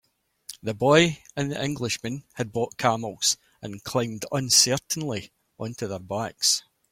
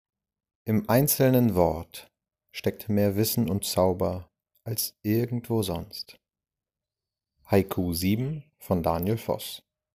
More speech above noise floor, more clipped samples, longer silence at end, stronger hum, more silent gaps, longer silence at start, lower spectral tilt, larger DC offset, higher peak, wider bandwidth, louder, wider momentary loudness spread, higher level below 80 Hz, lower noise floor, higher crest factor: second, 22 dB vs over 64 dB; neither; about the same, 0.3 s vs 0.35 s; neither; neither; second, 0.5 s vs 0.65 s; second, -3 dB/octave vs -5.5 dB/octave; neither; about the same, -4 dBFS vs -6 dBFS; about the same, 16.5 kHz vs 16 kHz; about the same, -24 LUFS vs -26 LUFS; about the same, 16 LU vs 17 LU; second, -60 dBFS vs -52 dBFS; second, -47 dBFS vs under -90 dBFS; about the same, 22 dB vs 20 dB